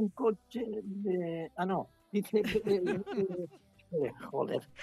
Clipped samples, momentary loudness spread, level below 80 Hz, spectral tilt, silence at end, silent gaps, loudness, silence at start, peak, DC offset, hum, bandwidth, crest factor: under 0.1%; 8 LU; -66 dBFS; -7 dB/octave; 0 s; none; -34 LUFS; 0 s; -18 dBFS; under 0.1%; none; 14 kHz; 16 dB